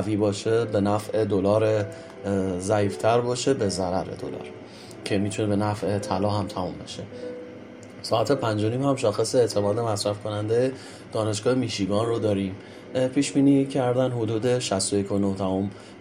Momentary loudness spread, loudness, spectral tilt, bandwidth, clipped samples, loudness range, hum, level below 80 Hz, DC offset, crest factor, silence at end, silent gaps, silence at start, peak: 14 LU; -25 LUFS; -5.5 dB/octave; 15 kHz; under 0.1%; 4 LU; none; -62 dBFS; under 0.1%; 18 dB; 0 s; none; 0 s; -8 dBFS